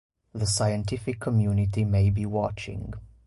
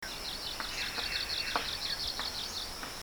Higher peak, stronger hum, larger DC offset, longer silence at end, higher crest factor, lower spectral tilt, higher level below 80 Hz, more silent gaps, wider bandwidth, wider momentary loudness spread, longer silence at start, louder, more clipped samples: about the same, -14 dBFS vs -14 dBFS; neither; neither; first, 0.2 s vs 0 s; second, 12 dB vs 24 dB; first, -6 dB/octave vs -1 dB/octave; first, -42 dBFS vs -52 dBFS; neither; second, 11.5 kHz vs over 20 kHz; first, 12 LU vs 5 LU; first, 0.35 s vs 0 s; first, -26 LUFS vs -34 LUFS; neither